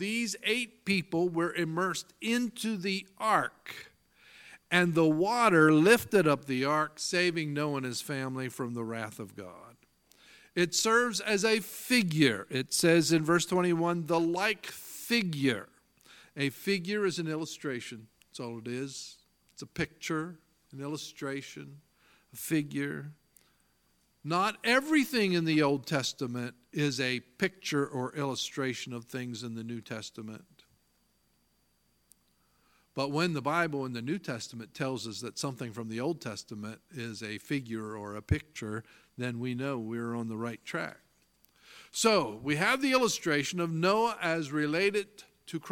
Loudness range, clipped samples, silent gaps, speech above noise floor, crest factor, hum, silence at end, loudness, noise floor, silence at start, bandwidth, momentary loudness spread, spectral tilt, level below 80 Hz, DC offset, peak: 12 LU; under 0.1%; none; 42 dB; 24 dB; none; 0 s; -30 LUFS; -72 dBFS; 0 s; 17.5 kHz; 16 LU; -4.5 dB/octave; -62 dBFS; under 0.1%; -8 dBFS